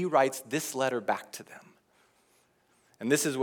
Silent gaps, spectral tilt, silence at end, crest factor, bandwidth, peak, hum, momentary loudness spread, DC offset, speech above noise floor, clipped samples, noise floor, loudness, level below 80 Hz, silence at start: none; -3.5 dB/octave; 0 s; 22 dB; over 20 kHz; -10 dBFS; none; 18 LU; under 0.1%; 39 dB; under 0.1%; -68 dBFS; -30 LUFS; -88 dBFS; 0 s